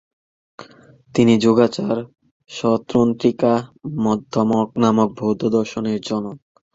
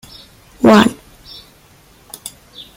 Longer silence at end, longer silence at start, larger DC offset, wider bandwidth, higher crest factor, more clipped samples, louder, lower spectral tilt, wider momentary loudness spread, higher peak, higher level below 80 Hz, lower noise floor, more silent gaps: second, 0.35 s vs 0.5 s; about the same, 0.6 s vs 0.6 s; neither; second, 7.8 kHz vs 16.5 kHz; about the same, 18 dB vs 16 dB; neither; second, -19 LUFS vs -12 LUFS; first, -6.5 dB/octave vs -5 dB/octave; second, 10 LU vs 27 LU; about the same, -2 dBFS vs 0 dBFS; second, -56 dBFS vs -50 dBFS; about the same, -48 dBFS vs -47 dBFS; first, 2.31-2.40 s vs none